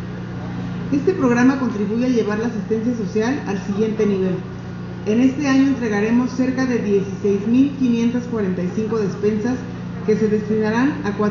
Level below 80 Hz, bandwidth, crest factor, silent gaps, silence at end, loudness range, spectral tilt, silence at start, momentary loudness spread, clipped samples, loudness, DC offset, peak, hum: -46 dBFS; 7.2 kHz; 14 dB; none; 0 s; 2 LU; -7 dB/octave; 0 s; 10 LU; under 0.1%; -20 LUFS; under 0.1%; -4 dBFS; 60 Hz at -35 dBFS